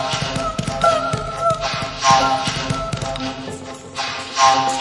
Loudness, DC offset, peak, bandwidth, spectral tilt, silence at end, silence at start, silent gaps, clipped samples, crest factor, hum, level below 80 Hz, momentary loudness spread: -19 LUFS; under 0.1%; 0 dBFS; 11.5 kHz; -3.5 dB/octave; 0 s; 0 s; none; under 0.1%; 18 dB; none; -40 dBFS; 12 LU